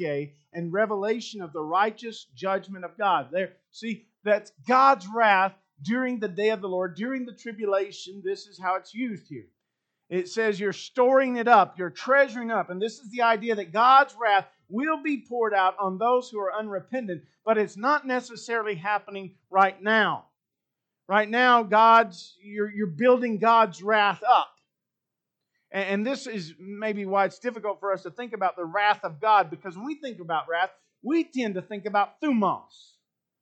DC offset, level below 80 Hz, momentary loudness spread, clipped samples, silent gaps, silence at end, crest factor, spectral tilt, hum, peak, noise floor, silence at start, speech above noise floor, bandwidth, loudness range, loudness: under 0.1%; -84 dBFS; 16 LU; under 0.1%; none; 0.85 s; 20 dB; -5 dB/octave; none; -4 dBFS; -86 dBFS; 0 s; 61 dB; 8.8 kHz; 7 LU; -25 LUFS